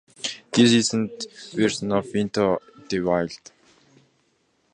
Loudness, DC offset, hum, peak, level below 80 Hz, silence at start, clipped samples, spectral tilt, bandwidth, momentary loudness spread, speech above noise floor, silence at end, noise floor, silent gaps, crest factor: -23 LUFS; under 0.1%; none; -4 dBFS; -58 dBFS; 0.25 s; under 0.1%; -4.5 dB/octave; 10.5 kHz; 14 LU; 45 dB; 1.35 s; -67 dBFS; none; 20 dB